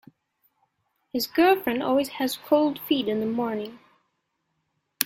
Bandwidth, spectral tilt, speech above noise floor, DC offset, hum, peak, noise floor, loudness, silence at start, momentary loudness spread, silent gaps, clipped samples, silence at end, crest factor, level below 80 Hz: 16.5 kHz; -3.5 dB/octave; 53 dB; under 0.1%; none; 0 dBFS; -76 dBFS; -24 LUFS; 1.15 s; 10 LU; none; under 0.1%; 0 s; 26 dB; -66 dBFS